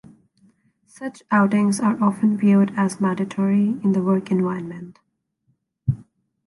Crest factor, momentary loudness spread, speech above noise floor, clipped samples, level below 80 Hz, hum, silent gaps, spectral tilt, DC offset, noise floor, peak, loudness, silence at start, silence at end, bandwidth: 16 dB; 16 LU; 49 dB; under 0.1%; -54 dBFS; none; none; -7.5 dB/octave; under 0.1%; -69 dBFS; -6 dBFS; -20 LUFS; 1 s; 0.45 s; 11.5 kHz